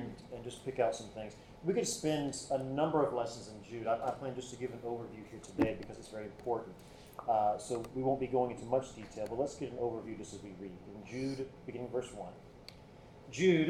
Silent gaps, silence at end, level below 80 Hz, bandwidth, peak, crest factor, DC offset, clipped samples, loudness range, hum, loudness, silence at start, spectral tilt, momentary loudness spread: none; 0 s; -62 dBFS; 15 kHz; -16 dBFS; 20 dB; under 0.1%; under 0.1%; 6 LU; none; -37 LUFS; 0 s; -5.5 dB/octave; 16 LU